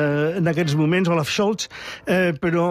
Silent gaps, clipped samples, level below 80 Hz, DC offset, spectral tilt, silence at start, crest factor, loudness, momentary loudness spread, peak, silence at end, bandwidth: none; under 0.1%; -54 dBFS; under 0.1%; -6 dB/octave; 0 s; 12 dB; -21 LUFS; 7 LU; -10 dBFS; 0 s; 15 kHz